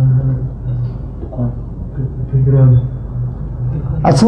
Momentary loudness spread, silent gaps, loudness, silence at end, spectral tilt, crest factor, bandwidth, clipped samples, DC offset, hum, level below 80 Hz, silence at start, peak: 13 LU; none; -17 LUFS; 0 s; -8.5 dB/octave; 14 dB; 9.8 kHz; under 0.1%; under 0.1%; none; -26 dBFS; 0 s; 0 dBFS